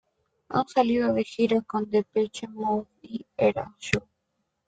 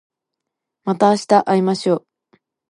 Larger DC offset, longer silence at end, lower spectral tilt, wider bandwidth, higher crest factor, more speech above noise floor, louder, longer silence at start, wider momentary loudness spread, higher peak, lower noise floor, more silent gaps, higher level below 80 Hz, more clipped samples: neither; about the same, 0.65 s vs 0.75 s; about the same, -6 dB/octave vs -6 dB/octave; second, 9.4 kHz vs 11.5 kHz; first, 24 dB vs 18 dB; second, 52 dB vs 65 dB; second, -26 LUFS vs -17 LUFS; second, 0.5 s vs 0.85 s; about the same, 9 LU vs 10 LU; second, -4 dBFS vs 0 dBFS; about the same, -78 dBFS vs -81 dBFS; neither; first, -58 dBFS vs -70 dBFS; neither